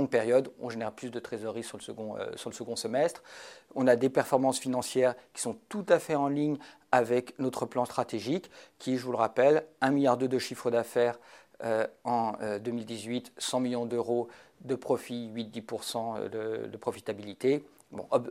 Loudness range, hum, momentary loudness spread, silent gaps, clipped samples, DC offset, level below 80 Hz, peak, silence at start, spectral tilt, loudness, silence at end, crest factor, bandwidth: 6 LU; none; 13 LU; none; under 0.1%; under 0.1%; -76 dBFS; -8 dBFS; 0 s; -5 dB/octave; -31 LUFS; 0 s; 22 dB; 16 kHz